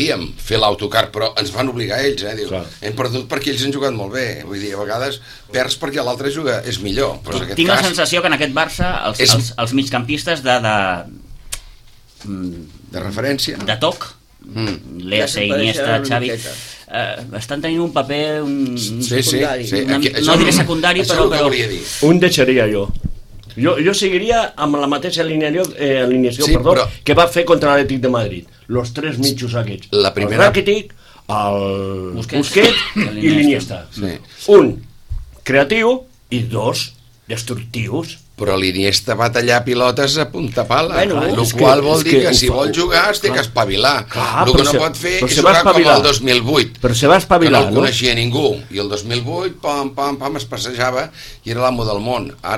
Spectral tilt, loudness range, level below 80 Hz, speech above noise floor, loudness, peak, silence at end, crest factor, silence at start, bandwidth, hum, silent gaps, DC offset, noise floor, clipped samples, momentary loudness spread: -4 dB/octave; 8 LU; -34 dBFS; 27 dB; -15 LUFS; 0 dBFS; 0 s; 16 dB; 0 s; 16.5 kHz; none; none; under 0.1%; -43 dBFS; under 0.1%; 14 LU